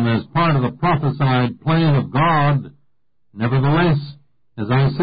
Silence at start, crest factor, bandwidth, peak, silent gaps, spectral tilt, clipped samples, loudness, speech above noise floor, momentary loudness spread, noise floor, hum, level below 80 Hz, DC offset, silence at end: 0 s; 10 dB; 5 kHz; -8 dBFS; none; -12.5 dB/octave; under 0.1%; -18 LUFS; 52 dB; 7 LU; -69 dBFS; none; -44 dBFS; under 0.1%; 0 s